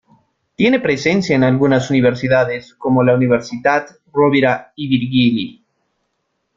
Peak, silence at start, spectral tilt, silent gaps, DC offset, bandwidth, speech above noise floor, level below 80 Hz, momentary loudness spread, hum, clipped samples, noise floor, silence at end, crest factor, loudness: -2 dBFS; 0.6 s; -6.5 dB/octave; none; under 0.1%; 7.6 kHz; 55 dB; -52 dBFS; 8 LU; none; under 0.1%; -70 dBFS; 1.05 s; 14 dB; -15 LUFS